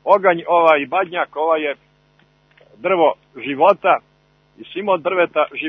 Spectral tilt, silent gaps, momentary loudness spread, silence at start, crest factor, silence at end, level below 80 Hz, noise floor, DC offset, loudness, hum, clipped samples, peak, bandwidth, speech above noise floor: -7 dB/octave; none; 13 LU; 0.05 s; 18 dB; 0 s; -68 dBFS; -57 dBFS; under 0.1%; -17 LUFS; none; under 0.1%; 0 dBFS; 5.8 kHz; 40 dB